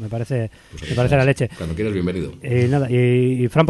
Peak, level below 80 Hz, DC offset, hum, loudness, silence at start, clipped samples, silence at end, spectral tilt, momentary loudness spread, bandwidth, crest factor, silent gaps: 0 dBFS; -40 dBFS; under 0.1%; none; -20 LUFS; 0 s; under 0.1%; 0 s; -7.5 dB/octave; 9 LU; 12 kHz; 18 dB; none